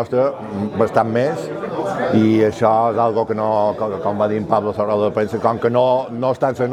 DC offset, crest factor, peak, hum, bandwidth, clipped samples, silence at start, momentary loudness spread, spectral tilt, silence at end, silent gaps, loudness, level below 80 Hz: under 0.1%; 18 dB; 0 dBFS; none; 12.5 kHz; under 0.1%; 0 s; 6 LU; -7.5 dB/octave; 0 s; none; -18 LUFS; -58 dBFS